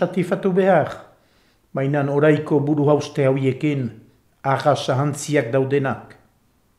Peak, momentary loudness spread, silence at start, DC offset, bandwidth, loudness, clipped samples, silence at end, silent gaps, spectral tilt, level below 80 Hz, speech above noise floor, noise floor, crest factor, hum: -4 dBFS; 11 LU; 0 s; under 0.1%; 13 kHz; -20 LUFS; under 0.1%; 0.75 s; none; -7 dB/octave; -64 dBFS; 42 dB; -61 dBFS; 18 dB; none